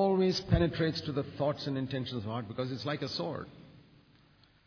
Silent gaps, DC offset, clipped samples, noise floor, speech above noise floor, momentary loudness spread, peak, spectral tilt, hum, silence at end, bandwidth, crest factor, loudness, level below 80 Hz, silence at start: none; under 0.1%; under 0.1%; -63 dBFS; 31 dB; 10 LU; -12 dBFS; -7 dB/octave; none; 0.85 s; 5.4 kHz; 20 dB; -33 LUFS; -48 dBFS; 0 s